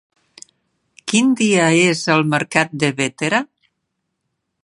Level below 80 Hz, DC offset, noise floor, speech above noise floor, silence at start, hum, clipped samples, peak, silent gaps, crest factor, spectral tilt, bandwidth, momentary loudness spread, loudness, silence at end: -64 dBFS; under 0.1%; -75 dBFS; 58 dB; 1.05 s; none; under 0.1%; 0 dBFS; none; 18 dB; -4 dB/octave; 11.5 kHz; 7 LU; -16 LUFS; 1.2 s